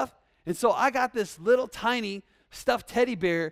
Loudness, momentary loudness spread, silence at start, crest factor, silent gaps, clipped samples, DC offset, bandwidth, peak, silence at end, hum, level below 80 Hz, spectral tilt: -27 LUFS; 11 LU; 0 s; 18 dB; none; under 0.1%; under 0.1%; 15.5 kHz; -10 dBFS; 0 s; none; -60 dBFS; -4.5 dB/octave